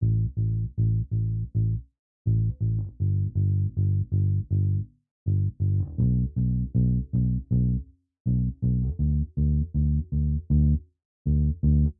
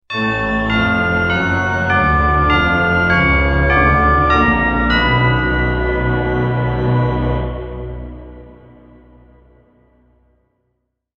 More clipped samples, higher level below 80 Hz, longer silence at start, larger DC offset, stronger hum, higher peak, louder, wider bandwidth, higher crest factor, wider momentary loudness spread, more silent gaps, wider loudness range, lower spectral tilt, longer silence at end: neither; second, -32 dBFS vs -24 dBFS; about the same, 0 s vs 0.1 s; neither; neither; second, -12 dBFS vs -2 dBFS; second, -26 LUFS vs -15 LUFS; second, 0.9 kHz vs 7 kHz; about the same, 12 dB vs 16 dB; second, 4 LU vs 9 LU; first, 1.99-2.25 s, 5.11-5.26 s, 8.20-8.25 s, 11.05-11.25 s vs none; second, 1 LU vs 10 LU; first, -17 dB/octave vs -7.5 dB/octave; second, 0.05 s vs 2.65 s